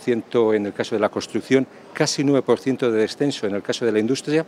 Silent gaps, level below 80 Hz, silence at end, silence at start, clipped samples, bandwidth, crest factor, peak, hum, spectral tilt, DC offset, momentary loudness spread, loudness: none; -70 dBFS; 0 s; 0 s; under 0.1%; 13 kHz; 16 dB; -4 dBFS; none; -5 dB/octave; under 0.1%; 5 LU; -21 LUFS